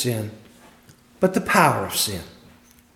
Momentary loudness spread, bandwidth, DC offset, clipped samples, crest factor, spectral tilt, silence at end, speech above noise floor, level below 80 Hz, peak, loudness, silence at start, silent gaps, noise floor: 15 LU; 17.5 kHz; under 0.1%; under 0.1%; 22 dB; -4 dB/octave; 0.65 s; 31 dB; -56 dBFS; -2 dBFS; -21 LUFS; 0 s; none; -52 dBFS